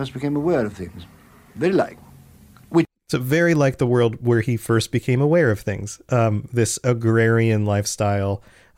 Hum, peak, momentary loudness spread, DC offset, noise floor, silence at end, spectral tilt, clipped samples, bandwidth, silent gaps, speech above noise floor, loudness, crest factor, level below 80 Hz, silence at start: none; -6 dBFS; 9 LU; under 0.1%; -48 dBFS; 0.4 s; -6 dB/octave; under 0.1%; 16 kHz; none; 28 dB; -20 LUFS; 14 dB; -52 dBFS; 0 s